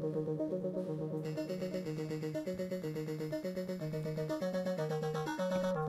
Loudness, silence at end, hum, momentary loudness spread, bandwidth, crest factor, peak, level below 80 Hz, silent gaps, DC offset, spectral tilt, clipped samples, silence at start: -38 LUFS; 0 s; none; 3 LU; 14 kHz; 14 dB; -22 dBFS; -68 dBFS; none; under 0.1%; -7 dB/octave; under 0.1%; 0 s